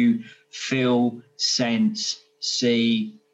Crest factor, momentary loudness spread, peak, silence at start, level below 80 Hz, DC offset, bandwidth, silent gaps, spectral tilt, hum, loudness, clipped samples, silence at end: 14 dB; 8 LU; -8 dBFS; 0 s; -74 dBFS; under 0.1%; 8.2 kHz; none; -4 dB/octave; none; -23 LUFS; under 0.1%; 0.2 s